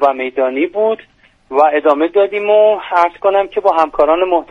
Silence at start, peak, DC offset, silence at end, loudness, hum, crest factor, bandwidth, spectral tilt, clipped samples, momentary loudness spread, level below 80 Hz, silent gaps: 0 s; 0 dBFS; under 0.1%; 0.05 s; -13 LUFS; none; 14 dB; 6.6 kHz; -5.5 dB/octave; under 0.1%; 6 LU; -50 dBFS; none